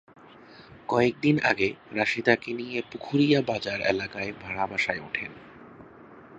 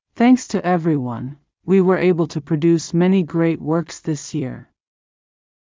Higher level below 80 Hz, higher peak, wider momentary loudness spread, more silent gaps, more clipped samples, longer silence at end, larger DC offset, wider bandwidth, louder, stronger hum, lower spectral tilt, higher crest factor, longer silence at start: about the same, -60 dBFS vs -58 dBFS; about the same, -4 dBFS vs -4 dBFS; about the same, 11 LU vs 13 LU; neither; neither; second, 0 s vs 1.15 s; neither; about the same, 8.2 kHz vs 7.6 kHz; second, -26 LUFS vs -18 LUFS; neither; about the same, -6 dB/octave vs -7 dB/octave; first, 24 dB vs 14 dB; first, 0.3 s vs 0.15 s